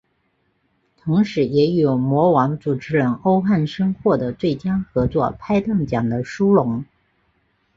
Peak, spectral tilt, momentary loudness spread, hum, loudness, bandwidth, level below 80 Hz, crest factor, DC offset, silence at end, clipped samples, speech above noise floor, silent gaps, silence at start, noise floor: -2 dBFS; -8.5 dB/octave; 6 LU; none; -19 LUFS; 7.4 kHz; -46 dBFS; 16 dB; under 0.1%; 0.9 s; under 0.1%; 48 dB; none; 1.05 s; -67 dBFS